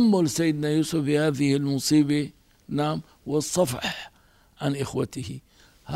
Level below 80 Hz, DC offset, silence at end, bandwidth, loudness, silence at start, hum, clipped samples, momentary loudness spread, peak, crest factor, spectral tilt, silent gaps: -58 dBFS; under 0.1%; 0 s; 16 kHz; -25 LUFS; 0 s; none; under 0.1%; 14 LU; -10 dBFS; 16 dB; -5.5 dB/octave; none